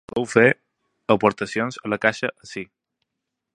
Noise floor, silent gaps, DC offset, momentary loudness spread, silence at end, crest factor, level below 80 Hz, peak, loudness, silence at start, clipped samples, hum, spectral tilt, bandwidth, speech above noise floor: -82 dBFS; none; under 0.1%; 18 LU; 0.9 s; 22 dB; -60 dBFS; -2 dBFS; -21 LUFS; 0.15 s; under 0.1%; none; -5.5 dB/octave; 10.5 kHz; 61 dB